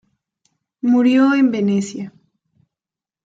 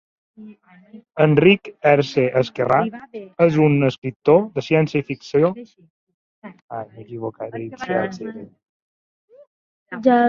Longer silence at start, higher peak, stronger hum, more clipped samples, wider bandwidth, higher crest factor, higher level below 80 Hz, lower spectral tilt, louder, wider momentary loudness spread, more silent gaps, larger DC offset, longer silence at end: first, 0.85 s vs 0.4 s; about the same, -4 dBFS vs -2 dBFS; neither; neither; about the same, 7.8 kHz vs 7.2 kHz; about the same, 14 dB vs 18 dB; second, -68 dBFS vs -60 dBFS; about the same, -6.5 dB/octave vs -7.5 dB/octave; first, -16 LUFS vs -19 LUFS; about the same, 17 LU vs 18 LU; second, none vs 3.98-4.02 s, 4.16-4.20 s, 5.90-6.07 s, 6.14-6.42 s, 6.62-6.68 s, 8.69-9.28 s, 9.47-9.86 s; neither; first, 1.15 s vs 0 s